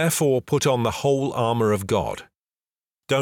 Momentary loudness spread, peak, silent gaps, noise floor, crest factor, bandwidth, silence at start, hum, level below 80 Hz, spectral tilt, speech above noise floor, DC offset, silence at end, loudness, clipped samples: 5 LU; -10 dBFS; 2.38-2.47 s; under -90 dBFS; 14 dB; 19.5 kHz; 0 s; none; -54 dBFS; -5 dB/octave; over 68 dB; under 0.1%; 0 s; -22 LUFS; under 0.1%